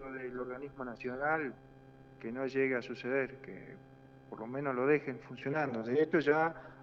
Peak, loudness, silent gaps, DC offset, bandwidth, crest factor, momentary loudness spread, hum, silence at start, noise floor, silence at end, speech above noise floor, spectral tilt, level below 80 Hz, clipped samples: -16 dBFS; -35 LUFS; none; under 0.1%; 7 kHz; 20 dB; 18 LU; none; 0 s; -56 dBFS; 0 s; 21 dB; -7.5 dB/octave; -68 dBFS; under 0.1%